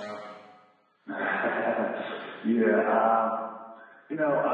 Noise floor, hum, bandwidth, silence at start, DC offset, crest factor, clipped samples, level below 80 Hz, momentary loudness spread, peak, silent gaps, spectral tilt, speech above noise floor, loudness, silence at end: -62 dBFS; none; 7 kHz; 0 s; under 0.1%; 18 dB; under 0.1%; -88 dBFS; 17 LU; -10 dBFS; none; -7.5 dB/octave; 37 dB; -27 LUFS; 0 s